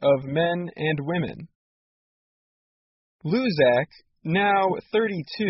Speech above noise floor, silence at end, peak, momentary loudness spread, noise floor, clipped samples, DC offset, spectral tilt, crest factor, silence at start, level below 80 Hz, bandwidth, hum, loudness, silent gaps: over 67 dB; 0 s; -8 dBFS; 14 LU; under -90 dBFS; under 0.1%; under 0.1%; -4.5 dB/octave; 18 dB; 0 s; -62 dBFS; 5.8 kHz; none; -24 LUFS; 1.55-3.19 s